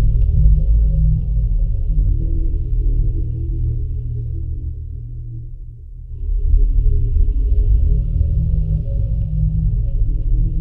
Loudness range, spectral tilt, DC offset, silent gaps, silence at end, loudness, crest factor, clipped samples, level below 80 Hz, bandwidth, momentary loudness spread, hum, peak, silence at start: 6 LU; -13 dB/octave; under 0.1%; none; 0 s; -20 LUFS; 14 dB; under 0.1%; -16 dBFS; 0.7 kHz; 14 LU; none; -2 dBFS; 0 s